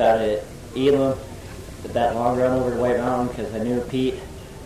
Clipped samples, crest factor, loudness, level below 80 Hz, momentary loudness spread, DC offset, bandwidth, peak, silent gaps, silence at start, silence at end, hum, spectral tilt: under 0.1%; 14 dB; -22 LUFS; -42 dBFS; 17 LU; under 0.1%; 15 kHz; -8 dBFS; none; 0 s; 0 s; none; -6.5 dB/octave